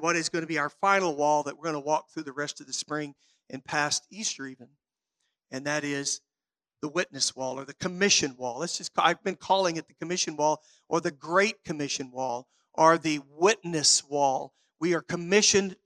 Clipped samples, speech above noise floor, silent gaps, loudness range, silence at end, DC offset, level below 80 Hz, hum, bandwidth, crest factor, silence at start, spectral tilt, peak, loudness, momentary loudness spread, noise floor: under 0.1%; over 62 dB; none; 7 LU; 0.1 s; under 0.1%; -72 dBFS; none; 13.5 kHz; 24 dB; 0 s; -2.5 dB/octave; -6 dBFS; -27 LUFS; 13 LU; under -90 dBFS